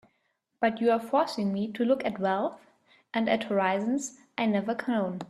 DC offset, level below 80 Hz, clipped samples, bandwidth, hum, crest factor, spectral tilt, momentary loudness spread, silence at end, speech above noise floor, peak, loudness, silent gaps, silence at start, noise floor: under 0.1%; -72 dBFS; under 0.1%; 13 kHz; none; 18 dB; -5.5 dB/octave; 5 LU; 0.05 s; 48 dB; -10 dBFS; -28 LUFS; none; 0.6 s; -76 dBFS